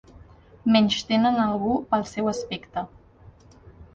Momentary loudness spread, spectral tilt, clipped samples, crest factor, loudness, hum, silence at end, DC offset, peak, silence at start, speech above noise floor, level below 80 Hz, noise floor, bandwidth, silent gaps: 13 LU; -5 dB/octave; under 0.1%; 18 dB; -24 LUFS; none; 0.1 s; under 0.1%; -8 dBFS; 0.65 s; 28 dB; -54 dBFS; -51 dBFS; 7.8 kHz; none